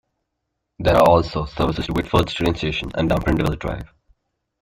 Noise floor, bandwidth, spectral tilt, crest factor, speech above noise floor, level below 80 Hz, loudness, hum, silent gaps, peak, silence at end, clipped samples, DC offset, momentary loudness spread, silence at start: -77 dBFS; 16 kHz; -6.5 dB/octave; 18 dB; 58 dB; -34 dBFS; -20 LUFS; none; none; -2 dBFS; 0.75 s; under 0.1%; under 0.1%; 11 LU; 0.8 s